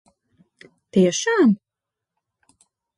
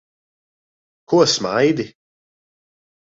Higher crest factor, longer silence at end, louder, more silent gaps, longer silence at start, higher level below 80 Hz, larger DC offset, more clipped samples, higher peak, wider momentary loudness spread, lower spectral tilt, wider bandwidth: about the same, 18 dB vs 20 dB; first, 1.4 s vs 1.2 s; about the same, -19 LUFS vs -17 LUFS; neither; second, 0.95 s vs 1.1 s; second, -68 dBFS vs -62 dBFS; neither; neither; second, -6 dBFS vs -2 dBFS; second, 7 LU vs 10 LU; about the same, -5 dB/octave vs -4 dB/octave; first, 11.5 kHz vs 8 kHz